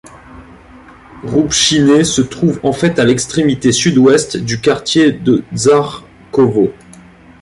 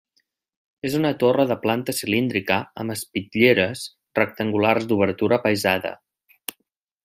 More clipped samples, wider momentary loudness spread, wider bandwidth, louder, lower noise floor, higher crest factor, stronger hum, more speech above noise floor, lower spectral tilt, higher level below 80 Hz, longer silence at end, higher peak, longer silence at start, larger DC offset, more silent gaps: neither; second, 8 LU vs 13 LU; second, 11.5 kHz vs 16 kHz; first, -12 LUFS vs -21 LUFS; second, -39 dBFS vs -75 dBFS; second, 12 dB vs 20 dB; neither; second, 28 dB vs 54 dB; about the same, -4.5 dB/octave vs -5 dB/octave; first, -42 dBFS vs -64 dBFS; second, 0.7 s vs 1.1 s; about the same, 0 dBFS vs -2 dBFS; second, 0.05 s vs 0.85 s; neither; neither